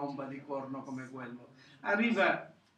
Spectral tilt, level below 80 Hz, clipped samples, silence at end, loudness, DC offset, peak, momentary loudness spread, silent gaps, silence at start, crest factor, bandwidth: -6 dB/octave; -86 dBFS; under 0.1%; 0.25 s; -34 LUFS; under 0.1%; -16 dBFS; 17 LU; none; 0 s; 20 dB; 9.2 kHz